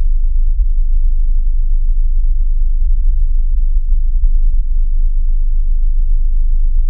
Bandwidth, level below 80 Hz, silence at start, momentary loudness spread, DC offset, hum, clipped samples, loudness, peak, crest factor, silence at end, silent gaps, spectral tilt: 0.2 kHz; -10 dBFS; 0 s; 2 LU; under 0.1%; none; under 0.1%; -20 LUFS; -2 dBFS; 8 dB; 0 s; none; -24 dB/octave